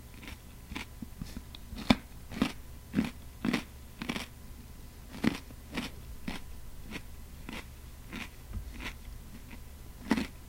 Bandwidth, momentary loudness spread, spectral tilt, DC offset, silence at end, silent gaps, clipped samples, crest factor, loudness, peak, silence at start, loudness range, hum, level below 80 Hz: 17 kHz; 16 LU; -5 dB/octave; under 0.1%; 0 s; none; under 0.1%; 34 dB; -38 LUFS; -4 dBFS; 0 s; 10 LU; none; -48 dBFS